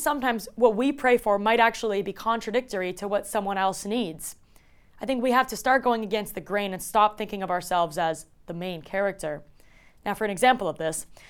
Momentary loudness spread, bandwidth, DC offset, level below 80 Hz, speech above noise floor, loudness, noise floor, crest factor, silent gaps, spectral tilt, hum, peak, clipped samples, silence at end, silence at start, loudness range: 12 LU; 18.5 kHz; under 0.1%; -54 dBFS; 30 dB; -25 LUFS; -55 dBFS; 20 dB; none; -4 dB/octave; none; -6 dBFS; under 0.1%; 0 s; 0 s; 4 LU